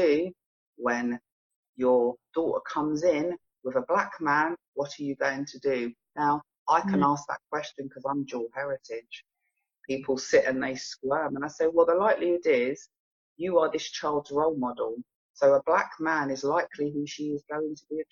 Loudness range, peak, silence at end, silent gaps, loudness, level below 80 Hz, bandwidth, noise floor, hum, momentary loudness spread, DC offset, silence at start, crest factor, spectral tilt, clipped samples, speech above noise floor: 4 LU; -10 dBFS; 0.1 s; 0.46-0.73 s, 1.32-1.50 s, 1.56-1.63 s, 1.69-1.73 s, 4.68-4.73 s, 6.58-6.66 s, 12.99-13.36 s, 15.15-15.34 s; -28 LUFS; -68 dBFS; 7.6 kHz; -81 dBFS; none; 11 LU; under 0.1%; 0 s; 18 dB; -5 dB/octave; under 0.1%; 54 dB